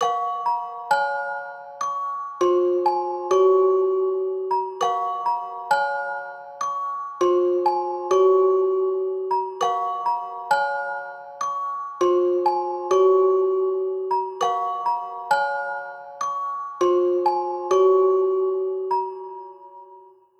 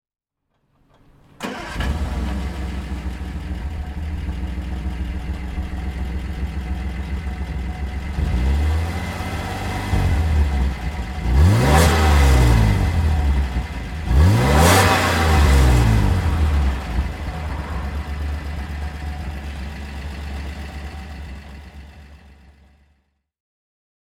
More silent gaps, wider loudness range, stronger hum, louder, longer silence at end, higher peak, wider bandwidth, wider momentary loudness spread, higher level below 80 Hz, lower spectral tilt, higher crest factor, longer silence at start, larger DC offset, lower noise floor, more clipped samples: neither; second, 3 LU vs 15 LU; neither; about the same, -22 LUFS vs -21 LUFS; second, 0.4 s vs 1.9 s; second, -8 dBFS vs 0 dBFS; second, 8.2 kHz vs 16.5 kHz; second, 12 LU vs 16 LU; second, -80 dBFS vs -22 dBFS; second, -4 dB/octave vs -5.5 dB/octave; second, 14 dB vs 20 dB; second, 0 s vs 1.4 s; neither; second, -49 dBFS vs -70 dBFS; neither